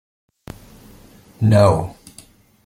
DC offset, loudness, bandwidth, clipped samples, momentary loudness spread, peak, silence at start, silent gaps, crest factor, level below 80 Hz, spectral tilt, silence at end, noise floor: under 0.1%; -16 LUFS; 13.5 kHz; under 0.1%; 27 LU; 0 dBFS; 1.4 s; none; 20 dB; -46 dBFS; -7.5 dB/octave; 0.75 s; -48 dBFS